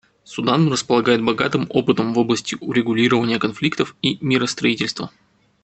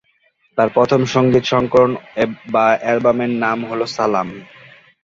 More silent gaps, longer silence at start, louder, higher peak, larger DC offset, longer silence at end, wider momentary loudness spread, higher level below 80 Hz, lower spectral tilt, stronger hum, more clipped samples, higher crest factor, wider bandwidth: neither; second, 0.3 s vs 0.55 s; second, -19 LUFS vs -16 LUFS; about the same, -2 dBFS vs -2 dBFS; neither; about the same, 0.55 s vs 0.6 s; about the same, 6 LU vs 7 LU; second, -58 dBFS vs -50 dBFS; about the same, -5 dB/octave vs -6 dB/octave; neither; neither; about the same, 18 dB vs 16 dB; first, 8.6 kHz vs 7.8 kHz